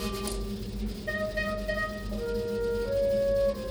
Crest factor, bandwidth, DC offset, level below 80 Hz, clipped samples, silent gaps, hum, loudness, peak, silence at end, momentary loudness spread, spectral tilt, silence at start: 14 dB; over 20 kHz; under 0.1%; -40 dBFS; under 0.1%; none; none; -30 LUFS; -14 dBFS; 0 s; 9 LU; -5 dB/octave; 0 s